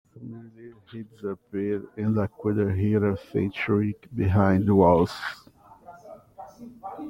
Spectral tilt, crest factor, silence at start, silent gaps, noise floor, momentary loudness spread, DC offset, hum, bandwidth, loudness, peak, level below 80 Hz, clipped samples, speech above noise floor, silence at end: -9 dB/octave; 20 dB; 0.15 s; none; -49 dBFS; 24 LU; under 0.1%; none; 11.5 kHz; -25 LUFS; -6 dBFS; -56 dBFS; under 0.1%; 25 dB; 0 s